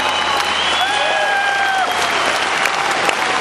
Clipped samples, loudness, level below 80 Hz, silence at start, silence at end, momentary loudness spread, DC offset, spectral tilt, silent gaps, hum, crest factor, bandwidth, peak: under 0.1%; -15 LUFS; -52 dBFS; 0 s; 0 s; 1 LU; under 0.1%; -1 dB/octave; none; none; 16 dB; 13 kHz; -2 dBFS